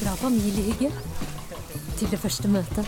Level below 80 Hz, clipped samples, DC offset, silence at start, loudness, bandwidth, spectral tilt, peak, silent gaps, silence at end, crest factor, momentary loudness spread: -38 dBFS; under 0.1%; under 0.1%; 0 s; -27 LUFS; 17.5 kHz; -5.5 dB/octave; -12 dBFS; none; 0 s; 14 dB; 12 LU